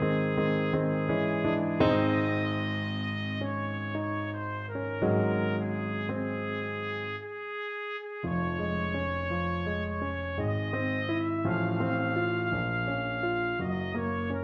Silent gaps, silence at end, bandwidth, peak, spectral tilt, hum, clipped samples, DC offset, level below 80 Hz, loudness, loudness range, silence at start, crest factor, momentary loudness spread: none; 0 s; 6.2 kHz; -12 dBFS; -9 dB/octave; none; under 0.1%; under 0.1%; -52 dBFS; -30 LUFS; 4 LU; 0 s; 18 dB; 7 LU